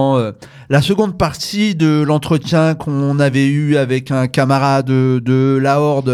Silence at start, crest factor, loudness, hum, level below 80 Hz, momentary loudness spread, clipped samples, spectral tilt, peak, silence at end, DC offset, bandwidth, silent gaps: 0 s; 12 dB; -15 LUFS; none; -44 dBFS; 4 LU; under 0.1%; -7 dB/octave; 0 dBFS; 0 s; under 0.1%; 14 kHz; none